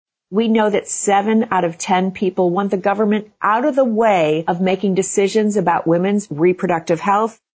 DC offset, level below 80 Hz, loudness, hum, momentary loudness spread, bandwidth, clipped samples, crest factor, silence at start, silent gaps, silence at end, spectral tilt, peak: under 0.1%; -60 dBFS; -17 LUFS; none; 4 LU; 8 kHz; under 0.1%; 12 dB; 0.3 s; none; 0.25 s; -5.5 dB/octave; -4 dBFS